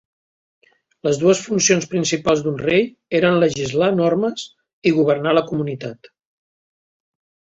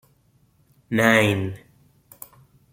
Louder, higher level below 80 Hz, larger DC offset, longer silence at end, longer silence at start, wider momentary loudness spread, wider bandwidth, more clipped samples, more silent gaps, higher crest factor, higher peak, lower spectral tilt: about the same, -18 LUFS vs -20 LUFS; first, -56 dBFS vs -62 dBFS; neither; first, 1.65 s vs 1.15 s; first, 1.05 s vs 0.9 s; second, 9 LU vs 26 LU; second, 8 kHz vs 16.5 kHz; neither; first, 4.73-4.82 s vs none; second, 18 dB vs 24 dB; about the same, -2 dBFS vs -2 dBFS; about the same, -4.5 dB/octave vs -5 dB/octave